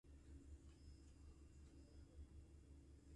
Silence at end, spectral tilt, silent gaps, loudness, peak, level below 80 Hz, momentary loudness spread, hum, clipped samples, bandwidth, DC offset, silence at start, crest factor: 0 s; -6.5 dB/octave; none; -65 LUFS; -50 dBFS; -64 dBFS; 3 LU; none; under 0.1%; 11 kHz; under 0.1%; 0.05 s; 14 dB